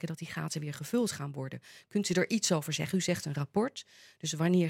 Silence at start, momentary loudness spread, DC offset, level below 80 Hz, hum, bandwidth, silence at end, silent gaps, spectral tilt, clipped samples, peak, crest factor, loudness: 0 s; 12 LU; under 0.1%; -72 dBFS; none; 16.5 kHz; 0 s; none; -4.5 dB/octave; under 0.1%; -14 dBFS; 18 dB; -33 LUFS